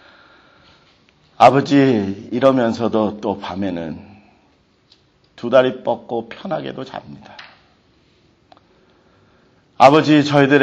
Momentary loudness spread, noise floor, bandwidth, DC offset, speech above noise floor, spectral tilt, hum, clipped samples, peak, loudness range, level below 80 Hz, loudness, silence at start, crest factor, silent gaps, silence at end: 20 LU; -57 dBFS; 8.8 kHz; under 0.1%; 42 dB; -6.5 dB/octave; none; under 0.1%; 0 dBFS; 14 LU; -58 dBFS; -16 LUFS; 1.4 s; 18 dB; none; 0 s